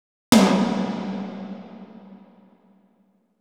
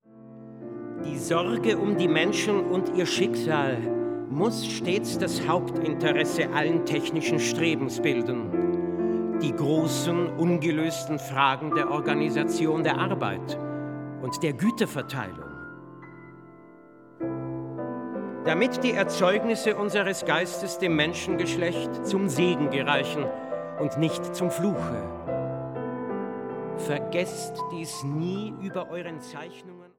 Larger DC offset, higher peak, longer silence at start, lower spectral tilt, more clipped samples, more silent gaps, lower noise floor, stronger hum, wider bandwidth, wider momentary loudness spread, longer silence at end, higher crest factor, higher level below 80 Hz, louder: neither; first, 0 dBFS vs -6 dBFS; first, 0.3 s vs 0.15 s; about the same, -5 dB/octave vs -5 dB/octave; neither; neither; first, -63 dBFS vs -50 dBFS; neither; about the same, 18.5 kHz vs 17 kHz; first, 26 LU vs 10 LU; first, 1.25 s vs 0.1 s; about the same, 24 dB vs 22 dB; about the same, -58 dBFS vs -62 dBFS; first, -21 LUFS vs -27 LUFS